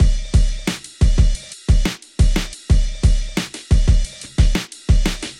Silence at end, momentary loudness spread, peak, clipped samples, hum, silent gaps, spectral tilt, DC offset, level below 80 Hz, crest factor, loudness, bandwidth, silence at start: 0.05 s; 8 LU; -2 dBFS; under 0.1%; none; none; -5 dB/octave; under 0.1%; -18 dBFS; 14 dB; -20 LUFS; 13 kHz; 0 s